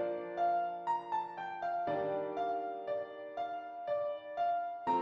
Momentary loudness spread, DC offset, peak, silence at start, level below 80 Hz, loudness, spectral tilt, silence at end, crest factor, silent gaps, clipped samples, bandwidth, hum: 7 LU; under 0.1%; -22 dBFS; 0 s; -78 dBFS; -37 LUFS; -6.5 dB/octave; 0 s; 14 dB; none; under 0.1%; 7.2 kHz; none